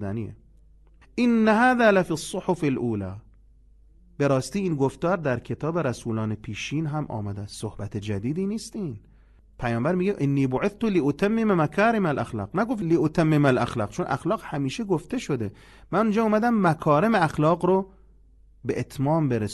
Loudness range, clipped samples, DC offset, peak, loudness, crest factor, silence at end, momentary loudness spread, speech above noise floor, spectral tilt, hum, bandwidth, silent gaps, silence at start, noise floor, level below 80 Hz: 6 LU; under 0.1%; under 0.1%; -6 dBFS; -24 LUFS; 18 dB; 0 s; 13 LU; 30 dB; -7 dB/octave; none; 12 kHz; none; 0 s; -54 dBFS; -52 dBFS